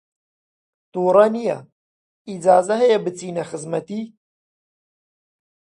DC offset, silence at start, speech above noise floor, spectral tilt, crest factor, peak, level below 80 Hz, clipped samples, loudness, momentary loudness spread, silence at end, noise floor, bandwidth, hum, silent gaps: under 0.1%; 0.95 s; over 72 dB; -5.5 dB/octave; 20 dB; -2 dBFS; -72 dBFS; under 0.1%; -19 LUFS; 17 LU; 1.7 s; under -90 dBFS; 11 kHz; none; 1.72-2.25 s